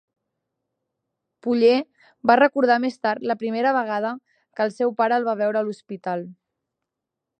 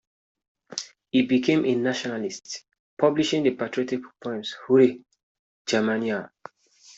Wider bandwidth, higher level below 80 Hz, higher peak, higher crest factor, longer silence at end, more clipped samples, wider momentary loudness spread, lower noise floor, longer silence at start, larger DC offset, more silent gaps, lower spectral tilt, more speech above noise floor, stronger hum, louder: first, 9.2 kHz vs 8 kHz; second, -76 dBFS vs -68 dBFS; first, -2 dBFS vs -6 dBFS; about the same, 22 dB vs 20 dB; first, 1.05 s vs 0.7 s; neither; about the same, 15 LU vs 15 LU; first, -84 dBFS vs -54 dBFS; first, 1.45 s vs 0.7 s; neither; second, none vs 2.79-2.97 s, 5.23-5.65 s; about the same, -6 dB/octave vs -5 dB/octave; first, 63 dB vs 31 dB; neither; about the same, -22 LUFS vs -24 LUFS